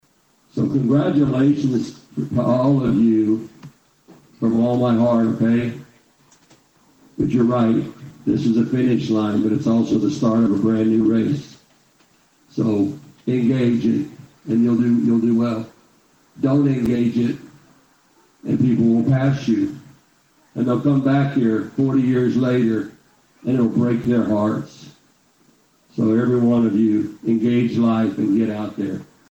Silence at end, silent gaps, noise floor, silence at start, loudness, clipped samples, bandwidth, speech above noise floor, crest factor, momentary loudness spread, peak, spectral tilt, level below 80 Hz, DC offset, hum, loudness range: 0.25 s; none; -60 dBFS; 0.55 s; -19 LUFS; under 0.1%; 8.2 kHz; 42 dB; 12 dB; 11 LU; -6 dBFS; -8.5 dB/octave; -54 dBFS; under 0.1%; none; 3 LU